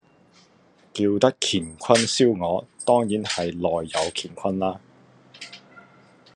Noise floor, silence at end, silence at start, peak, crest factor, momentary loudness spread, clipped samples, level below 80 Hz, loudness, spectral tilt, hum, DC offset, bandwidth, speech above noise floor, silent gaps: -57 dBFS; 0.55 s; 0.95 s; -2 dBFS; 24 dB; 18 LU; under 0.1%; -64 dBFS; -23 LUFS; -4 dB/octave; none; under 0.1%; 11.5 kHz; 35 dB; none